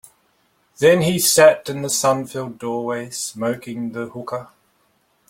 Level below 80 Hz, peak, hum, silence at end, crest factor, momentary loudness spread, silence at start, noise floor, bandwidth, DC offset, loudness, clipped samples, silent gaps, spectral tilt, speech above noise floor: -60 dBFS; 0 dBFS; none; 0.85 s; 20 dB; 16 LU; 0.8 s; -63 dBFS; 16.5 kHz; under 0.1%; -19 LUFS; under 0.1%; none; -3.5 dB/octave; 44 dB